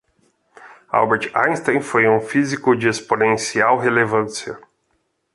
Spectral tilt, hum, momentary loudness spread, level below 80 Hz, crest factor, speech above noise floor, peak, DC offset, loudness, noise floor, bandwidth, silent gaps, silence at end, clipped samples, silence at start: -4.5 dB/octave; none; 7 LU; -60 dBFS; 18 dB; 50 dB; -2 dBFS; under 0.1%; -18 LUFS; -68 dBFS; 11.5 kHz; none; 0.75 s; under 0.1%; 0.6 s